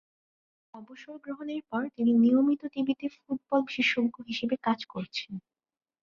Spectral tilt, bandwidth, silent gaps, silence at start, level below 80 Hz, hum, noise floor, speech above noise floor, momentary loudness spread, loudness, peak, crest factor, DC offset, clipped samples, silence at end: -5.5 dB/octave; 7.2 kHz; none; 0.75 s; -74 dBFS; none; under -90 dBFS; over 61 dB; 19 LU; -29 LUFS; -12 dBFS; 18 dB; under 0.1%; under 0.1%; 0.65 s